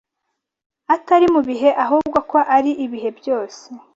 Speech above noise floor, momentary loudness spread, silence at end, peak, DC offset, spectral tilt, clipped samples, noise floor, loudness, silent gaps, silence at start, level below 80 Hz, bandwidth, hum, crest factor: 60 dB; 11 LU; 0.15 s; -2 dBFS; under 0.1%; -5.5 dB/octave; under 0.1%; -77 dBFS; -17 LUFS; none; 0.9 s; -58 dBFS; 7.8 kHz; none; 16 dB